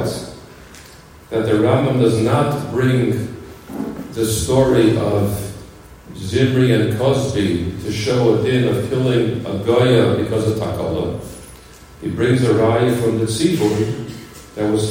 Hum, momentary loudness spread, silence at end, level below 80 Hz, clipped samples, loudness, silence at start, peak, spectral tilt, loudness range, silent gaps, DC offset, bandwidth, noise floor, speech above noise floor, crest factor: none; 15 LU; 0 s; -44 dBFS; under 0.1%; -17 LUFS; 0 s; -2 dBFS; -6.5 dB/octave; 2 LU; none; under 0.1%; 16.5 kHz; -41 dBFS; 25 dB; 16 dB